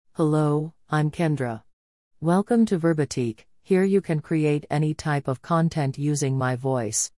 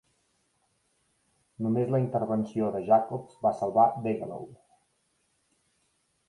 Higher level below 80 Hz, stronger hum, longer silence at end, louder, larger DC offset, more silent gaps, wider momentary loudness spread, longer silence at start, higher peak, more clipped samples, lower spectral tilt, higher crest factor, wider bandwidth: first, -60 dBFS vs -68 dBFS; neither; second, 0.1 s vs 1.75 s; first, -24 LUFS vs -27 LUFS; first, 0.1% vs under 0.1%; first, 1.73-2.11 s vs none; second, 7 LU vs 12 LU; second, 0.2 s vs 1.6 s; about the same, -10 dBFS vs -10 dBFS; neither; second, -6 dB/octave vs -9.5 dB/octave; second, 14 dB vs 20 dB; about the same, 12 kHz vs 11.5 kHz